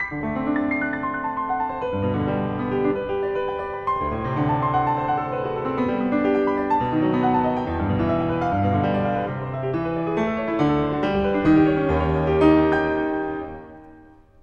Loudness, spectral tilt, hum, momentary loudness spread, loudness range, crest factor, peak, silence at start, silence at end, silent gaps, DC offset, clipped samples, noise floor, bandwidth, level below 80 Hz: -22 LUFS; -9 dB/octave; none; 8 LU; 4 LU; 18 dB; -4 dBFS; 0 s; 0.4 s; none; under 0.1%; under 0.1%; -48 dBFS; 6.8 kHz; -42 dBFS